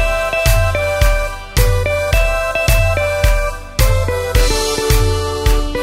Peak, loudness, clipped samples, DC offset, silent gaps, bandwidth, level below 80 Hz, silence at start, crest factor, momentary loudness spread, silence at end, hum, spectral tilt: 0 dBFS; -16 LUFS; under 0.1%; under 0.1%; none; 16.5 kHz; -16 dBFS; 0 s; 14 dB; 3 LU; 0 s; none; -4 dB/octave